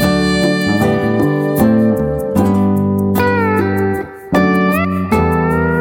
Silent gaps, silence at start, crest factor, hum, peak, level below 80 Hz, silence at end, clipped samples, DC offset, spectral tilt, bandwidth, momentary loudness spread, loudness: none; 0 s; 12 dB; none; -2 dBFS; -34 dBFS; 0 s; under 0.1%; under 0.1%; -7 dB/octave; 17 kHz; 4 LU; -14 LUFS